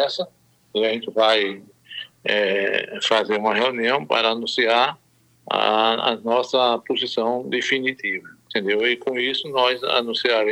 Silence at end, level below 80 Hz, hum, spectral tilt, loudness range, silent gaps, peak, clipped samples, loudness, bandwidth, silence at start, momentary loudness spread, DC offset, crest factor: 0 s; -76 dBFS; none; -3.5 dB/octave; 2 LU; none; -4 dBFS; under 0.1%; -21 LUFS; 13 kHz; 0 s; 9 LU; under 0.1%; 16 dB